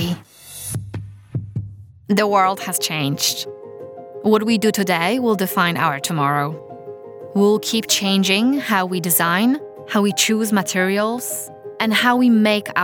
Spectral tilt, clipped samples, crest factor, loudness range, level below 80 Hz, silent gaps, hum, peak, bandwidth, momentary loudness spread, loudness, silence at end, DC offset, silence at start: -4 dB/octave; under 0.1%; 16 dB; 4 LU; -60 dBFS; none; none; -2 dBFS; over 20 kHz; 17 LU; -18 LUFS; 0 s; under 0.1%; 0 s